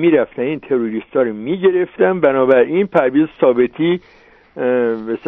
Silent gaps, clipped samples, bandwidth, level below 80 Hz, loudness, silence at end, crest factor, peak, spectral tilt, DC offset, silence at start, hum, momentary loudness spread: none; under 0.1%; 3.9 kHz; -56 dBFS; -16 LUFS; 0 s; 16 dB; 0 dBFS; -9.5 dB/octave; under 0.1%; 0 s; none; 7 LU